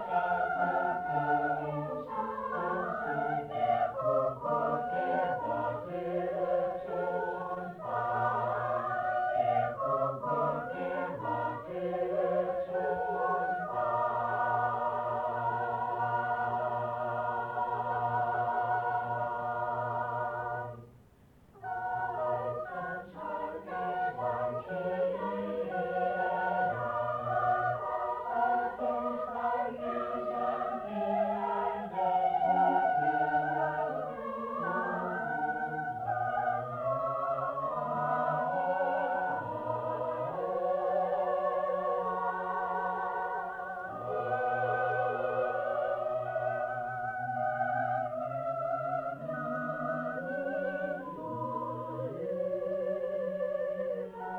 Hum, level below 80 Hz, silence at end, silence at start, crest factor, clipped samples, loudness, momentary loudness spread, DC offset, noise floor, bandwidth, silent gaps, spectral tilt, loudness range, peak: none; -68 dBFS; 0 s; 0 s; 16 dB; under 0.1%; -33 LUFS; 6 LU; under 0.1%; -60 dBFS; 5.4 kHz; none; -8 dB/octave; 4 LU; -16 dBFS